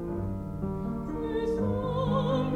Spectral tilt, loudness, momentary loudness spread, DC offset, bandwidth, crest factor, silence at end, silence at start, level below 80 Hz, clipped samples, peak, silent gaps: -8.5 dB/octave; -31 LUFS; 7 LU; under 0.1%; 9.4 kHz; 14 dB; 0 s; 0 s; -42 dBFS; under 0.1%; -14 dBFS; none